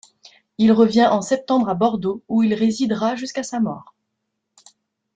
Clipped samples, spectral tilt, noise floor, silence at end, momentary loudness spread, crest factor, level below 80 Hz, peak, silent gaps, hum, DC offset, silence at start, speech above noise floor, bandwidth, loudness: under 0.1%; -5.5 dB/octave; -77 dBFS; 1.35 s; 11 LU; 18 dB; -62 dBFS; -2 dBFS; none; none; under 0.1%; 0.6 s; 59 dB; 9 kHz; -19 LUFS